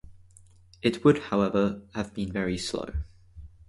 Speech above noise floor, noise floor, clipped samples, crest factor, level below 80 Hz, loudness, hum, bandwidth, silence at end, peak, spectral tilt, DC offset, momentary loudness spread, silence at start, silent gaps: 28 dB; -55 dBFS; under 0.1%; 22 dB; -44 dBFS; -27 LUFS; none; 11.5 kHz; 0.2 s; -6 dBFS; -6 dB/octave; under 0.1%; 13 LU; 0.05 s; none